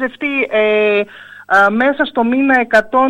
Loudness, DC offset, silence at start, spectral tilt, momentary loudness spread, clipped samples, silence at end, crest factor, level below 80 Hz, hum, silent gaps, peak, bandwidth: -13 LUFS; under 0.1%; 0 s; -5.5 dB/octave; 6 LU; under 0.1%; 0 s; 12 dB; -52 dBFS; none; none; -2 dBFS; 11.5 kHz